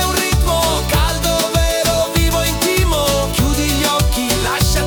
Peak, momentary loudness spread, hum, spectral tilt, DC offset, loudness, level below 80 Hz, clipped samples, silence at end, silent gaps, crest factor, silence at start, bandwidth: -2 dBFS; 1 LU; none; -4 dB/octave; under 0.1%; -15 LUFS; -20 dBFS; under 0.1%; 0 s; none; 12 dB; 0 s; over 20 kHz